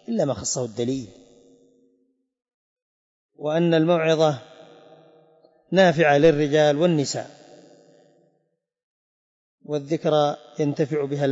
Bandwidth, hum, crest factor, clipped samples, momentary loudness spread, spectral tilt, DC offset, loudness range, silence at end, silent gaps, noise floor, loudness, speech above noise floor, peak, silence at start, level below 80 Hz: 8 kHz; none; 18 dB; under 0.1%; 14 LU; -5.5 dB/octave; under 0.1%; 10 LU; 0 s; 2.54-2.76 s, 2.82-3.29 s, 8.83-9.58 s; -73 dBFS; -21 LUFS; 53 dB; -6 dBFS; 0.1 s; -62 dBFS